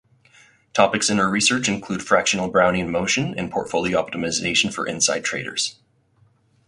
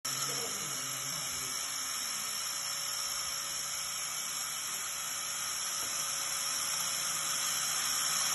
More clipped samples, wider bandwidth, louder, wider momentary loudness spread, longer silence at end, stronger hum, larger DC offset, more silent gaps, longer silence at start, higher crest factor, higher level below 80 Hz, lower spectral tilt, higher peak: neither; about the same, 11.5 kHz vs 12 kHz; first, -20 LUFS vs -33 LUFS; first, 7 LU vs 4 LU; first, 0.95 s vs 0 s; neither; neither; neither; first, 0.75 s vs 0.05 s; about the same, 20 dB vs 18 dB; first, -52 dBFS vs -70 dBFS; first, -3 dB/octave vs 1 dB/octave; first, -2 dBFS vs -18 dBFS